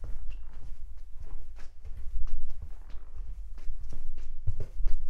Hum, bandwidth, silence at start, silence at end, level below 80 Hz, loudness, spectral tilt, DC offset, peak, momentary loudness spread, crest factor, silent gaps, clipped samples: none; 0.8 kHz; 0 s; 0 s; -32 dBFS; -44 LUFS; -7 dB/octave; under 0.1%; -10 dBFS; 11 LU; 14 dB; none; under 0.1%